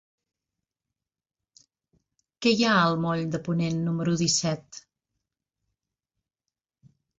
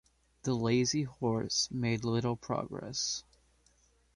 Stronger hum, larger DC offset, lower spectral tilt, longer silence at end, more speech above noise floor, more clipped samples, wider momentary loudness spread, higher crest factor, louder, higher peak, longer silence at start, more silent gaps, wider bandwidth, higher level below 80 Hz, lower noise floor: neither; neither; about the same, -4.5 dB/octave vs -4.5 dB/octave; first, 2.4 s vs 0.95 s; first, 64 dB vs 36 dB; neither; first, 12 LU vs 8 LU; about the same, 20 dB vs 16 dB; first, -25 LUFS vs -33 LUFS; first, -10 dBFS vs -18 dBFS; first, 2.4 s vs 0.45 s; neither; second, 8.2 kHz vs 11.5 kHz; about the same, -64 dBFS vs -62 dBFS; first, -88 dBFS vs -68 dBFS